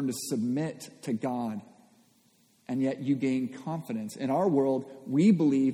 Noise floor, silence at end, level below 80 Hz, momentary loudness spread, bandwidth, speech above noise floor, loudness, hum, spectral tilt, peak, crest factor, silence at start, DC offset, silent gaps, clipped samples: -65 dBFS; 0 s; -76 dBFS; 13 LU; 16 kHz; 37 dB; -29 LUFS; none; -7 dB/octave; -12 dBFS; 16 dB; 0 s; under 0.1%; none; under 0.1%